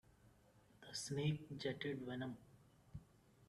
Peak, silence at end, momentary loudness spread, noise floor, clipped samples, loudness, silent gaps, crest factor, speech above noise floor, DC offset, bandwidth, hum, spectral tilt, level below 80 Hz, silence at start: -28 dBFS; 0.05 s; 18 LU; -70 dBFS; under 0.1%; -45 LUFS; none; 20 dB; 26 dB; under 0.1%; 13 kHz; none; -5 dB/octave; -74 dBFS; 0.25 s